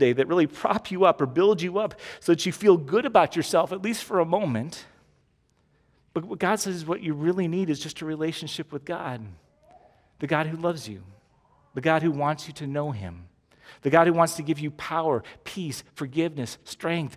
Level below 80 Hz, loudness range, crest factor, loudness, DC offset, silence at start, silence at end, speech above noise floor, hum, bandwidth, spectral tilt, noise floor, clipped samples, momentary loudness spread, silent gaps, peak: -60 dBFS; 8 LU; 22 dB; -25 LUFS; under 0.1%; 0 s; 0 s; 42 dB; none; 16 kHz; -5.5 dB/octave; -67 dBFS; under 0.1%; 14 LU; none; -4 dBFS